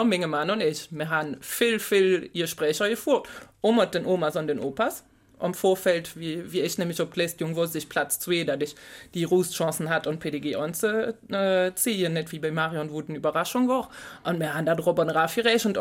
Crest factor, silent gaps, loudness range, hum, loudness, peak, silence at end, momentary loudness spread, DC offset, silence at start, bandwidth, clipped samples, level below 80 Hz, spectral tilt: 18 dB; none; 3 LU; none; -26 LUFS; -8 dBFS; 0 s; 9 LU; under 0.1%; 0 s; 17 kHz; under 0.1%; -64 dBFS; -4.5 dB/octave